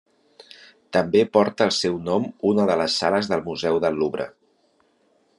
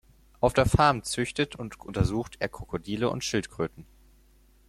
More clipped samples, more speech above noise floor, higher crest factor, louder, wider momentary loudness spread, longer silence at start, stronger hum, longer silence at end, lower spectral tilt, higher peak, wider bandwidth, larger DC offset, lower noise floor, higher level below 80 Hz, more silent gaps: neither; first, 43 dB vs 32 dB; about the same, 20 dB vs 22 dB; first, -22 LUFS vs -28 LUFS; second, 6 LU vs 12 LU; first, 0.9 s vs 0.4 s; neither; first, 1.1 s vs 0.85 s; about the same, -5 dB/octave vs -5 dB/octave; first, -4 dBFS vs -8 dBFS; second, 11.5 kHz vs 15 kHz; neither; first, -64 dBFS vs -59 dBFS; second, -64 dBFS vs -44 dBFS; neither